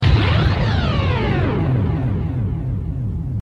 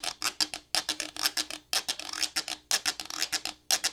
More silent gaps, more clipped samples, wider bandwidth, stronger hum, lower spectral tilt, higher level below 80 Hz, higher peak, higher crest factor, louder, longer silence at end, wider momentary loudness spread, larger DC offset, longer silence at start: neither; neither; second, 7 kHz vs over 20 kHz; neither; first, -8 dB/octave vs 1.5 dB/octave; first, -26 dBFS vs -66 dBFS; about the same, -4 dBFS vs -6 dBFS; second, 14 dB vs 26 dB; first, -19 LUFS vs -30 LUFS; about the same, 0 s vs 0 s; first, 8 LU vs 5 LU; neither; about the same, 0 s vs 0 s